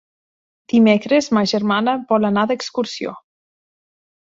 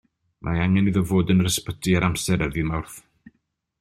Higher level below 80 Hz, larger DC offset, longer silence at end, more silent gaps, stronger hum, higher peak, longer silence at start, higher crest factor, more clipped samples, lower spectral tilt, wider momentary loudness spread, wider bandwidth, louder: second, -62 dBFS vs -42 dBFS; neither; first, 1.15 s vs 0.8 s; neither; neither; about the same, -2 dBFS vs -4 dBFS; first, 0.7 s vs 0.45 s; about the same, 18 dB vs 18 dB; neither; about the same, -5.5 dB/octave vs -5.5 dB/octave; about the same, 10 LU vs 12 LU; second, 7.6 kHz vs 14.5 kHz; first, -17 LUFS vs -22 LUFS